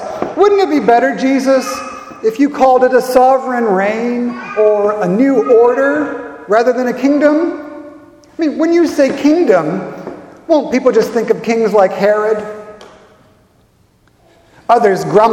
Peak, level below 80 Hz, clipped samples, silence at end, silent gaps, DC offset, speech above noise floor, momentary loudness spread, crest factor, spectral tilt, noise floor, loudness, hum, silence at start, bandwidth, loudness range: 0 dBFS; -54 dBFS; under 0.1%; 0 s; none; under 0.1%; 41 dB; 14 LU; 12 dB; -6 dB/octave; -52 dBFS; -12 LUFS; none; 0 s; 16.5 kHz; 4 LU